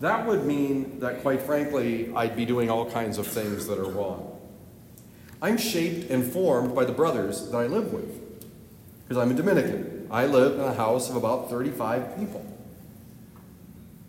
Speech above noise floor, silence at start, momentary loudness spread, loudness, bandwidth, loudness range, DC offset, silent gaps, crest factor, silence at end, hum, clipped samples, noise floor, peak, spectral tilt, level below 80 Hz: 23 dB; 0 s; 16 LU; -26 LUFS; 16 kHz; 5 LU; under 0.1%; none; 20 dB; 0.05 s; none; under 0.1%; -48 dBFS; -8 dBFS; -5.5 dB/octave; -60 dBFS